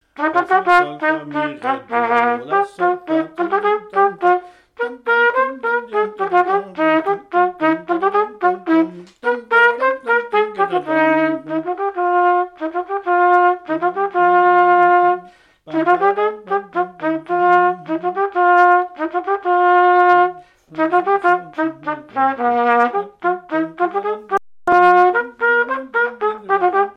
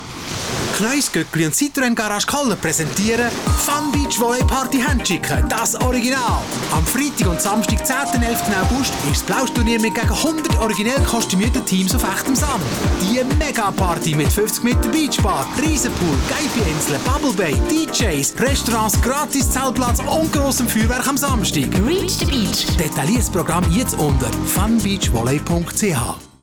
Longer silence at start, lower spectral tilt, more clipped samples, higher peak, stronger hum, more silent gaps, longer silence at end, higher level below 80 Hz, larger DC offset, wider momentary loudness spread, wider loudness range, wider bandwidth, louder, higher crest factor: first, 0.2 s vs 0 s; first, -6 dB/octave vs -4 dB/octave; neither; first, 0 dBFS vs -8 dBFS; neither; neither; about the same, 0.05 s vs 0.15 s; second, -64 dBFS vs -28 dBFS; second, under 0.1% vs 0.2%; first, 10 LU vs 2 LU; about the same, 3 LU vs 1 LU; second, 6.8 kHz vs over 20 kHz; about the same, -17 LUFS vs -18 LUFS; first, 16 dB vs 10 dB